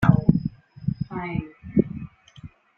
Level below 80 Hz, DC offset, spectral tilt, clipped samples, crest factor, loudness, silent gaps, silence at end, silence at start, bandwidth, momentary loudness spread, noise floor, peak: -44 dBFS; under 0.1%; -10 dB/octave; under 0.1%; 22 dB; -26 LUFS; none; 0.3 s; 0 s; 5.4 kHz; 24 LU; -46 dBFS; -2 dBFS